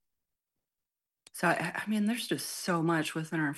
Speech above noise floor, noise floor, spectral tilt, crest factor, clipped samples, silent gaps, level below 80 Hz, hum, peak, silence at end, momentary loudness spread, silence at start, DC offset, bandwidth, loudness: over 59 dB; under -90 dBFS; -4.5 dB/octave; 20 dB; under 0.1%; none; -78 dBFS; none; -14 dBFS; 0 s; 5 LU; 1.35 s; under 0.1%; 12.5 kHz; -31 LUFS